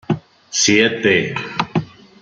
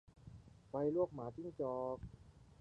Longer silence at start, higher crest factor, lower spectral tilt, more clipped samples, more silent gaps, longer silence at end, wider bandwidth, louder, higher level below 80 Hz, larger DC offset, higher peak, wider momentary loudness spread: about the same, 0.1 s vs 0.15 s; about the same, 18 dB vs 18 dB; second, -3 dB/octave vs -10 dB/octave; neither; neither; first, 0.35 s vs 0.05 s; first, 10 kHz vs 9 kHz; first, -17 LUFS vs -42 LUFS; first, -56 dBFS vs -66 dBFS; neither; first, -2 dBFS vs -24 dBFS; second, 11 LU vs 22 LU